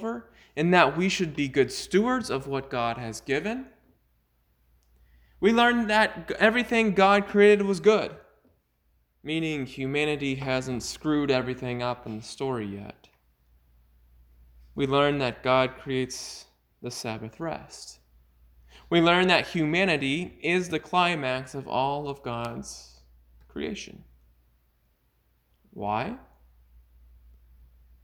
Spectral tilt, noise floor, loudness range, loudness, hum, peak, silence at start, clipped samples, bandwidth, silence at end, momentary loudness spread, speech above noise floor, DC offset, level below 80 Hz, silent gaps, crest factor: -5 dB/octave; -69 dBFS; 15 LU; -25 LUFS; none; -4 dBFS; 0 s; under 0.1%; 20 kHz; 1.85 s; 18 LU; 44 dB; under 0.1%; -56 dBFS; none; 22 dB